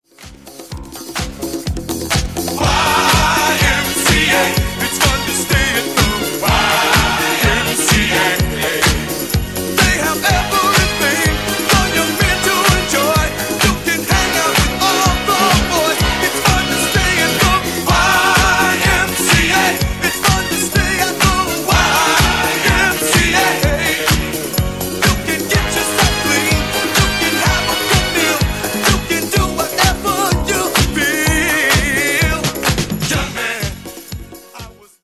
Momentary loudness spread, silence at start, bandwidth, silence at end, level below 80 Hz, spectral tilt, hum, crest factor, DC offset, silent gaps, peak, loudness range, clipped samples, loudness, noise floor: 7 LU; 0.2 s; 16 kHz; 0.3 s; -24 dBFS; -3 dB/octave; none; 14 dB; 0.4%; none; 0 dBFS; 2 LU; under 0.1%; -14 LUFS; -37 dBFS